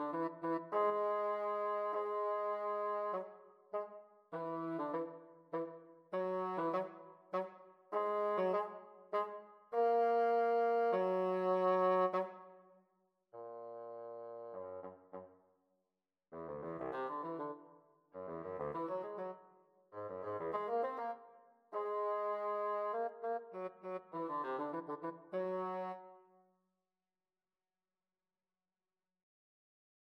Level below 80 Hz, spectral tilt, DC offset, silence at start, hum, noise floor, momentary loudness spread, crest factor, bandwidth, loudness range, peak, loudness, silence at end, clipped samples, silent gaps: -84 dBFS; -8 dB/octave; under 0.1%; 0 s; none; under -90 dBFS; 18 LU; 16 dB; 6.2 kHz; 13 LU; -24 dBFS; -39 LUFS; 3.9 s; under 0.1%; none